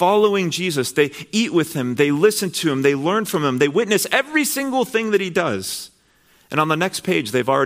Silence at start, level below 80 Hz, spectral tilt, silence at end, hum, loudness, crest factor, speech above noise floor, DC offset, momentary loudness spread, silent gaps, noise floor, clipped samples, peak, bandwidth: 0 s; -64 dBFS; -4 dB/octave; 0 s; none; -19 LUFS; 18 dB; 38 dB; under 0.1%; 5 LU; none; -56 dBFS; under 0.1%; -2 dBFS; 16 kHz